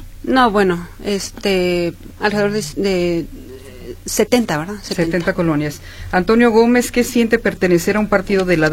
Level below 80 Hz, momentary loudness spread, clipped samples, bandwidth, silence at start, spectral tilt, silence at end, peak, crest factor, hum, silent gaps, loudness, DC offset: -36 dBFS; 11 LU; under 0.1%; 16.5 kHz; 0 s; -5 dB/octave; 0 s; 0 dBFS; 16 dB; none; none; -16 LUFS; under 0.1%